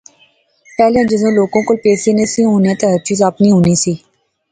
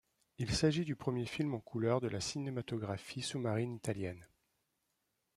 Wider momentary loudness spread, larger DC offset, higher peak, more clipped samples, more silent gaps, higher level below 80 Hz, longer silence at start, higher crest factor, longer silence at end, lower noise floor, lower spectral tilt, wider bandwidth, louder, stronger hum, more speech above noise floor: second, 4 LU vs 9 LU; neither; first, 0 dBFS vs -18 dBFS; neither; neither; first, -46 dBFS vs -60 dBFS; first, 0.8 s vs 0.4 s; second, 12 dB vs 20 dB; second, 0.55 s vs 1.1 s; second, -53 dBFS vs -83 dBFS; about the same, -5.5 dB/octave vs -5.5 dB/octave; second, 9.4 kHz vs 13.5 kHz; first, -12 LUFS vs -38 LUFS; neither; second, 41 dB vs 46 dB